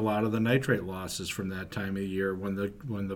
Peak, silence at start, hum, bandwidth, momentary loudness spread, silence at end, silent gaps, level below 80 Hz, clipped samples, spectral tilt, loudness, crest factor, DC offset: -12 dBFS; 0 s; none; 19 kHz; 9 LU; 0 s; none; -56 dBFS; under 0.1%; -5.5 dB/octave; -31 LUFS; 18 dB; under 0.1%